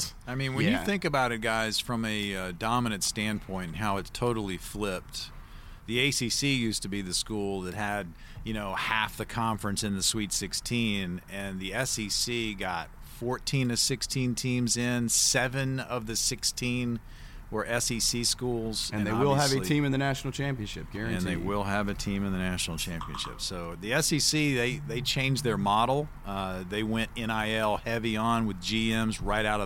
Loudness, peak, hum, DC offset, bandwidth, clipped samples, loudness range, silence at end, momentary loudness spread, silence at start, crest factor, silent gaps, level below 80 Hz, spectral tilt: -29 LUFS; -10 dBFS; none; under 0.1%; 17 kHz; under 0.1%; 4 LU; 0 s; 10 LU; 0 s; 18 dB; none; -46 dBFS; -3.5 dB/octave